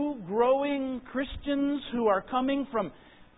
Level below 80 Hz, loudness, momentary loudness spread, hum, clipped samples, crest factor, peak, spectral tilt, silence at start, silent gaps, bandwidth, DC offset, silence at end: -54 dBFS; -29 LUFS; 8 LU; none; under 0.1%; 16 dB; -12 dBFS; -9.5 dB/octave; 0 s; none; 4 kHz; under 0.1%; 0.4 s